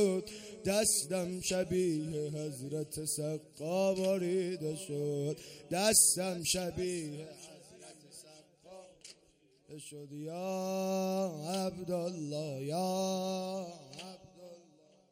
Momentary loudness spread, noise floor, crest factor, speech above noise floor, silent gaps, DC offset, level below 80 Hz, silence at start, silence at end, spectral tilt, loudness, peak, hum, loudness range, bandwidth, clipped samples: 23 LU; -68 dBFS; 24 dB; 33 dB; none; under 0.1%; -66 dBFS; 0 s; 0.5 s; -3.5 dB/octave; -34 LUFS; -12 dBFS; none; 13 LU; 16 kHz; under 0.1%